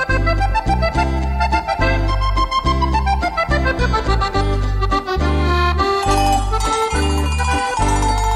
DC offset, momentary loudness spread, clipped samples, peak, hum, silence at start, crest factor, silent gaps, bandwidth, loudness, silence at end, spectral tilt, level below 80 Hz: under 0.1%; 3 LU; under 0.1%; -4 dBFS; none; 0 s; 12 dB; none; 13.5 kHz; -18 LUFS; 0 s; -5 dB/octave; -20 dBFS